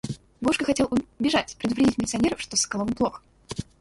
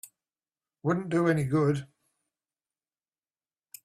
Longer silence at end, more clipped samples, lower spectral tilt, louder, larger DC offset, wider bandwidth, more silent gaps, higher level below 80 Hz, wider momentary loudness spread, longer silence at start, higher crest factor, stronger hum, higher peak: second, 0.2 s vs 2 s; neither; second, -3.5 dB/octave vs -7.5 dB/octave; first, -25 LUFS vs -28 LUFS; neither; second, 11.5 kHz vs 15 kHz; neither; first, -50 dBFS vs -66 dBFS; first, 12 LU vs 8 LU; about the same, 0.05 s vs 0.05 s; about the same, 16 dB vs 18 dB; neither; first, -8 dBFS vs -14 dBFS